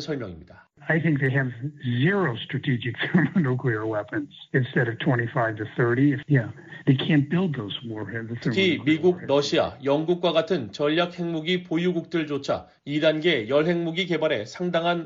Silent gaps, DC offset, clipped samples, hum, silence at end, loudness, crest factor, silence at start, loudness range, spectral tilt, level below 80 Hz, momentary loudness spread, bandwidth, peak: none; under 0.1%; under 0.1%; none; 0 s; -24 LUFS; 16 dB; 0 s; 2 LU; -5 dB/octave; -62 dBFS; 9 LU; 7.6 kHz; -8 dBFS